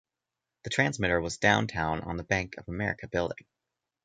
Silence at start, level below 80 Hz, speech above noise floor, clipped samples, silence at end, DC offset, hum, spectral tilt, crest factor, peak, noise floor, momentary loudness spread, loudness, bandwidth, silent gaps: 0.65 s; -50 dBFS; 59 dB; under 0.1%; 0.7 s; under 0.1%; none; -4.5 dB/octave; 24 dB; -6 dBFS; -88 dBFS; 11 LU; -29 LUFS; 9.4 kHz; none